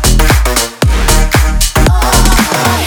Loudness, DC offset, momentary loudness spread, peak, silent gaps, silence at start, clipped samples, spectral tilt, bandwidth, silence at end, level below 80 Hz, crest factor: -10 LUFS; under 0.1%; 3 LU; 0 dBFS; none; 0 s; 0.2%; -3.5 dB/octave; over 20 kHz; 0 s; -12 dBFS; 8 dB